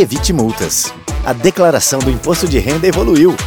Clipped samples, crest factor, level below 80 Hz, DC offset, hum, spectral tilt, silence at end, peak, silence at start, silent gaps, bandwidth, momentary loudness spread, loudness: under 0.1%; 12 dB; -24 dBFS; under 0.1%; none; -4.5 dB/octave; 0 s; 0 dBFS; 0 s; none; over 20 kHz; 5 LU; -13 LUFS